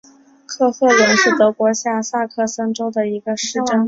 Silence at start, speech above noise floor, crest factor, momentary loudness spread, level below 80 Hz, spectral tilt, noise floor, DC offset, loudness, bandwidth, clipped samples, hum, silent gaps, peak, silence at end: 0.5 s; 22 dB; 16 dB; 9 LU; -60 dBFS; -3 dB/octave; -38 dBFS; under 0.1%; -16 LUFS; 7.8 kHz; under 0.1%; none; none; -2 dBFS; 0 s